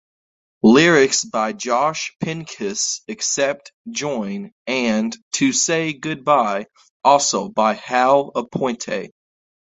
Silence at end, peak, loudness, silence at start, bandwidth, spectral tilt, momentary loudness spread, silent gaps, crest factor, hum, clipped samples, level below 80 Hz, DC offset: 0.65 s; 0 dBFS; -19 LUFS; 0.65 s; 8.4 kHz; -3 dB/octave; 13 LU; 3.74-3.85 s, 4.52-4.65 s, 5.22-5.31 s, 6.90-7.00 s; 20 dB; none; under 0.1%; -60 dBFS; under 0.1%